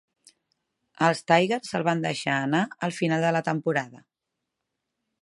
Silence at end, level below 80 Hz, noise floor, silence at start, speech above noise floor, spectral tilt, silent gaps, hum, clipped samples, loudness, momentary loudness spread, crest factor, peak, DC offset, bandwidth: 1.25 s; -72 dBFS; -84 dBFS; 1 s; 59 dB; -5.5 dB/octave; none; none; under 0.1%; -25 LUFS; 6 LU; 22 dB; -6 dBFS; under 0.1%; 11.5 kHz